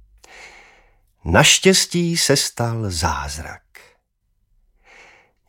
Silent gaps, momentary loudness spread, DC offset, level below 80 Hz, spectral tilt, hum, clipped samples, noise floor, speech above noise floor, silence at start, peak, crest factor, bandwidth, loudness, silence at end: none; 19 LU; under 0.1%; -42 dBFS; -3 dB/octave; none; under 0.1%; -67 dBFS; 50 dB; 0.35 s; 0 dBFS; 20 dB; 17 kHz; -16 LUFS; 1.9 s